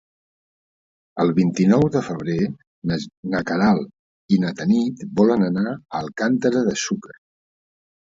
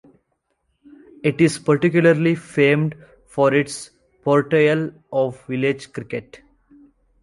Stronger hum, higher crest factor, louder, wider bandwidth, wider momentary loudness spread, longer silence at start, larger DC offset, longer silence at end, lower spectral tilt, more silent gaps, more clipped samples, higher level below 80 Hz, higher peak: neither; about the same, 18 dB vs 18 dB; about the same, -21 LUFS vs -19 LUFS; second, 7.8 kHz vs 11.5 kHz; second, 10 LU vs 14 LU; about the same, 1.15 s vs 1.25 s; neither; first, 1 s vs 0.85 s; about the same, -6.5 dB/octave vs -6.5 dB/octave; first, 2.67-2.82 s, 3.17-3.23 s, 3.99-4.29 s vs none; neither; first, -54 dBFS vs -60 dBFS; about the same, -4 dBFS vs -2 dBFS